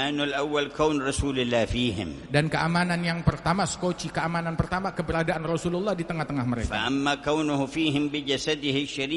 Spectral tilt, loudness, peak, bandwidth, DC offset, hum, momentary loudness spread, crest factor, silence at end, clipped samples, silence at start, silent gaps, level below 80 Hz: -5 dB/octave; -26 LUFS; -6 dBFS; 11.5 kHz; under 0.1%; none; 4 LU; 20 dB; 0 s; under 0.1%; 0 s; none; -44 dBFS